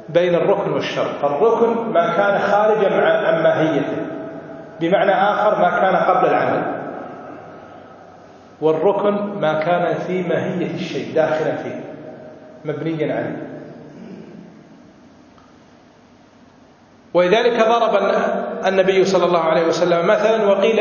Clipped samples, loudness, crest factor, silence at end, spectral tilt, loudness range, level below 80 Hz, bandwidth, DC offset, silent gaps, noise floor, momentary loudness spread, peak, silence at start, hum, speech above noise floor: under 0.1%; -17 LUFS; 18 dB; 0 s; -6 dB/octave; 12 LU; -62 dBFS; 7.2 kHz; under 0.1%; none; -48 dBFS; 19 LU; 0 dBFS; 0 s; none; 32 dB